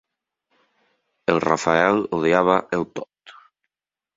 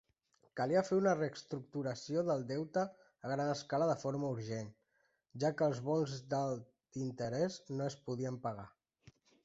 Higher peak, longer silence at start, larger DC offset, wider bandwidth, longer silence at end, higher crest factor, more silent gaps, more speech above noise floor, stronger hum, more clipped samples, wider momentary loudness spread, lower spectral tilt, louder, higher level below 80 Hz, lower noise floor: first, -2 dBFS vs -20 dBFS; first, 1.3 s vs 0.55 s; neither; about the same, 7.8 kHz vs 8 kHz; first, 0.85 s vs 0.35 s; about the same, 22 dB vs 18 dB; neither; first, 69 dB vs 42 dB; neither; neither; about the same, 13 LU vs 12 LU; about the same, -5.5 dB/octave vs -6 dB/octave; first, -20 LUFS vs -38 LUFS; first, -58 dBFS vs -76 dBFS; first, -89 dBFS vs -79 dBFS